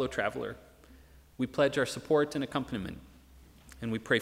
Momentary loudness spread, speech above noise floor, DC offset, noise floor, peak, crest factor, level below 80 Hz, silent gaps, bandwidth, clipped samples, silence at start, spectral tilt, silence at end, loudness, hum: 13 LU; 25 dB; under 0.1%; -56 dBFS; -12 dBFS; 22 dB; -58 dBFS; none; 16 kHz; under 0.1%; 0 s; -5 dB/octave; 0 s; -32 LUFS; none